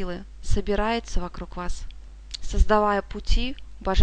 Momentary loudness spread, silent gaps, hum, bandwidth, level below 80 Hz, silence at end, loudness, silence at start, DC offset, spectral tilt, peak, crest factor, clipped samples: 17 LU; none; none; 9.2 kHz; -28 dBFS; 0 s; -27 LUFS; 0 s; under 0.1%; -5.5 dB/octave; -6 dBFS; 18 dB; under 0.1%